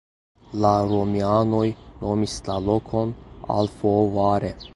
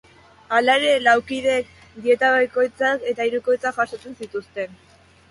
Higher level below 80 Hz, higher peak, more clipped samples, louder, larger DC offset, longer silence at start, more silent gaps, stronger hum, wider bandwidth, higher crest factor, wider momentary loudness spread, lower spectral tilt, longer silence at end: first, -44 dBFS vs -60 dBFS; about the same, -4 dBFS vs -4 dBFS; neither; second, -23 LUFS vs -20 LUFS; neither; about the same, 0.5 s vs 0.5 s; neither; neither; about the same, 11.5 kHz vs 11.5 kHz; about the same, 18 dB vs 18 dB; second, 7 LU vs 15 LU; first, -7.5 dB/octave vs -3 dB/octave; second, 0.05 s vs 0.55 s